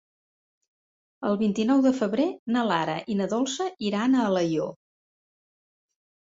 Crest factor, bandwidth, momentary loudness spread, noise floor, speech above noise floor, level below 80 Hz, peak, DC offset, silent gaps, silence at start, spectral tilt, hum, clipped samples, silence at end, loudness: 18 dB; 7.8 kHz; 7 LU; under -90 dBFS; over 66 dB; -68 dBFS; -8 dBFS; under 0.1%; 2.39-2.46 s; 1.2 s; -5.5 dB/octave; none; under 0.1%; 1.45 s; -25 LUFS